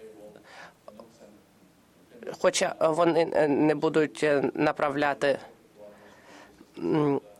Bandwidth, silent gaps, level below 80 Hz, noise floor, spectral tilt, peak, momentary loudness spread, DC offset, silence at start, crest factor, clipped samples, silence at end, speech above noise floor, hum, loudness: 14 kHz; none; -68 dBFS; -59 dBFS; -5 dB/octave; -10 dBFS; 19 LU; under 0.1%; 0 s; 18 dB; under 0.1%; 0.2 s; 34 dB; none; -26 LUFS